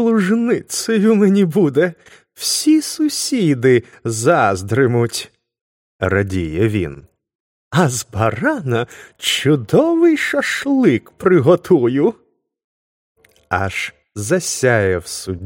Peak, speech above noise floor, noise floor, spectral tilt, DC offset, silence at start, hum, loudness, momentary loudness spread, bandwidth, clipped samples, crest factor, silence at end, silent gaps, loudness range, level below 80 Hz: 0 dBFS; over 74 dB; under -90 dBFS; -5 dB/octave; under 0.1%; 0 s; none; -16 LUFS; 9 LU; 16.5 kHz; under 0.1%; 16 dB; 0 s; 5.61-5.99 s, 7.35-7.71 s, 12.64-13.15 s; 5 LU; -48 dBFS